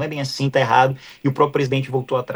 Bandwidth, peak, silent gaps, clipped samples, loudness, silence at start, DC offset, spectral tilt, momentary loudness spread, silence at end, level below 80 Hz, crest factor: over 20 kHz; -2 dBFS; none; under 0.1%; -19 LUFS; 0 s; under 0.1%; -6 dB/octave; 8 LU; 0 s; -60 dBFS; 16 dB